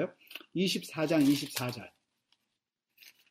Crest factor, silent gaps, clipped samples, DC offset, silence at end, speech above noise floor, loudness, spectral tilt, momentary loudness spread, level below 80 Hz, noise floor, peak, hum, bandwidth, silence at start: 18 dB; none; under 0.1%; under 0.1%; 0.2 s; 55 dB; -31 LUFS; -5 dB/octave; 15 LU; -74 dBFS; -85 dBFS; -16 dBFS; none; 16 kHz; 0 s